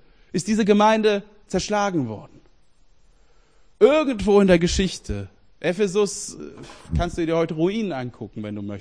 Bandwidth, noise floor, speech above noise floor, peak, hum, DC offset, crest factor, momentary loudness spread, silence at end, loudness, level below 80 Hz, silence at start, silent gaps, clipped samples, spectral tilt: 10.5 kHz; -58 dBFS; 37 dB; -2 dBFS; none; 0.2%; 20 dB; 17 LU; 0 s; -21 LUFS; -40 dBFS; 0.35 s; none; under 0.1%; -5.5 dB/octave